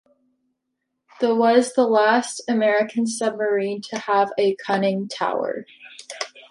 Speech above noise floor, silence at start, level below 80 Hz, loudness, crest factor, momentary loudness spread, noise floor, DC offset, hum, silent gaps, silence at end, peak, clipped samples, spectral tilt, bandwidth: 58 dB; 1.2 s; -74 dBFS; -21 LUFS; 18 dB; 15 LU; -78 dBFS; under 0.1%; none; none; 0.1 s; -4 dBFS; under 0.1%; -4.5 dB/octave; 11.5 kHz